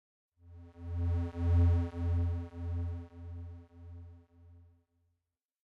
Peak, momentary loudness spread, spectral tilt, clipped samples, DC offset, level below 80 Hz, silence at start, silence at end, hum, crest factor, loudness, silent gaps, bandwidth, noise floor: -20 dBFS; 24 LU; -10 dB/octave; under 0.1%; under 0.1%; -48 dBFS; 0.45 s; 1.05 s; none; 16 dB; -34 LUFS; none; 3.7 kHz; -88 dBFS